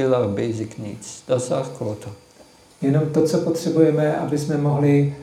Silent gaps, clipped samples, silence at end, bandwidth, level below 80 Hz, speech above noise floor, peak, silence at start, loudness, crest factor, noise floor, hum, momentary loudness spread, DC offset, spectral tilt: none; under 0.1%; 0 s; 14 kHz; -60 dBFS; 29 dB; -4 dBFS; 0 s; -21 LUFS; 18 dB; -50 dBFS; none; 15 LU; under 0.1%; -7 dB/octave